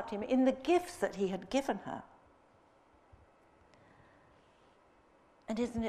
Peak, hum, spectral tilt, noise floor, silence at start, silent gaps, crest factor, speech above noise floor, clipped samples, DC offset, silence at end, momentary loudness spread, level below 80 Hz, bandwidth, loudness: -18 dBFS; none; -5.5 dB/octave; -66 dBFS; 0 s; none; 20 dB; 32 dB; under 0.1%; under 0.1%; 0 s; 14 LU; -64 dBFS; 14.5 kHz; -34 LUFS